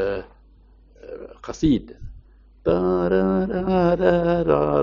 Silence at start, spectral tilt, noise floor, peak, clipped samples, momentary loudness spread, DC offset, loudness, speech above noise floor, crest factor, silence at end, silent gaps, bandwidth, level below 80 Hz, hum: 0 s; -7 dB/octave; -51 dBFS; -4 dBFS; under 0.1%; 19 LU; under 0.1%; -21 LUFS; 32 dB; 18 dB; 0 s; none; 7.4 kHz; -40 dBFS; none